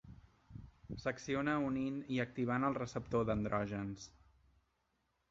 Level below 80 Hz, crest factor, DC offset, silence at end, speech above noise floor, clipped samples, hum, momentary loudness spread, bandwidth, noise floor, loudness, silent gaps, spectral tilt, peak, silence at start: -60 dBFS; 18 dB; under 0.1%; 1.2 s; 44 dB; under 0.1%; none; 20 LU; 7.8 kHz; -81 dBFS; -38 LUFS; none; -6 dB/octave; -22 dBFS; 0.05 s